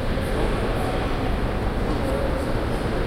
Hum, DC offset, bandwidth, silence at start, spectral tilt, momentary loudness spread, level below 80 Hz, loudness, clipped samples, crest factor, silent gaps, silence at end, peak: none; under 0.1%; 16 kHz; 0 s; -6.5 dB/octave; 1 LU; -28 dBFS; -25 LUFS; under 0.1%; 12 dB; none; 0 s; -10 dBFS